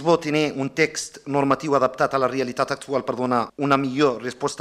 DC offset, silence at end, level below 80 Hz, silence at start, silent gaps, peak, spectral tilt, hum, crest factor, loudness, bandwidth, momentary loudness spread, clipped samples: under 0.1%; 0 s; -60 dBFS; 0 s; none; -2 dBFS; -5 dB/octave; none; 20 dB; -22 LUFS; 14 kHz; 6 LU; under 0.1%